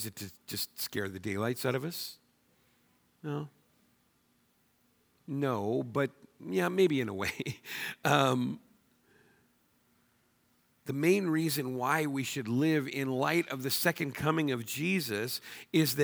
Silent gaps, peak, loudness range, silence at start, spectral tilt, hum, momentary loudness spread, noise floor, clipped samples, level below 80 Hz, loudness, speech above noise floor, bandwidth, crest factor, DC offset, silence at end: none; -10 dBFS; 8 LU; 0 s; -5 dB/octave; none; 12 LU; -71 dBFS; under 0.1%; -72 dBFS; -32 LUFS; 40 dB; over 20 kHz; 24 dB; under 0.1%; 0 s